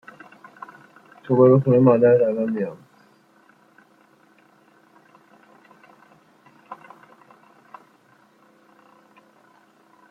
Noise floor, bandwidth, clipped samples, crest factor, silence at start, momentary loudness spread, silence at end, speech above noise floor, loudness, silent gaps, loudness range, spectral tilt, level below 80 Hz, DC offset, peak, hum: -57 dBFS; 4.2 kHz; under 0.1%; 22 dB; 1.3 s; 28 LU; 3.35 s; 41 dB; -18 LUFS; none; 14 LU; -11 dB/octave; -70 dBFS; under 0.1%; -2 dBFS; none